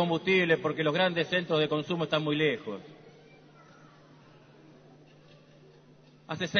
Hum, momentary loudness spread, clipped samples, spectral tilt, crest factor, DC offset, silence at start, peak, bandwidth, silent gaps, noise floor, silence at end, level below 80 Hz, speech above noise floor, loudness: none; 12 LU; under 0.1%; -6 dB/octave; 20 dB; under 0.1%; 0 s; -10 dBFS; 6.6 kHz; none; -57 dBFS; 0 s; -72 dBFS; 29 dB; -28 LUFS